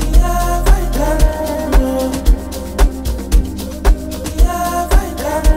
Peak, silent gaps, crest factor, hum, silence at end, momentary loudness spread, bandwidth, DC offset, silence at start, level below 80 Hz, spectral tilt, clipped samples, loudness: 0 dBFS; none; 12 dB; none; 0 s; 5 LU; 16 kHz; under 0.1%; 0 s; -14 dBFS; -5.5 dB/octave; under 0.1%; -17 LUFS